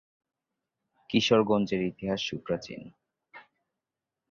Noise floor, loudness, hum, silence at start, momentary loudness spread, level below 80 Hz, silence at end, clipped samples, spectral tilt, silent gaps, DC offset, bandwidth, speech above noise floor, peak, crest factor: -89 dBFS; -28 LUFS; none; 1.1 s; 12 LU; -64 dBFS; 0.9 s; under 0.1%; -5.5 dB/octave; none; under 0.1%; 7.4 kHz; 61 dB; -10 dBFS; 22 dB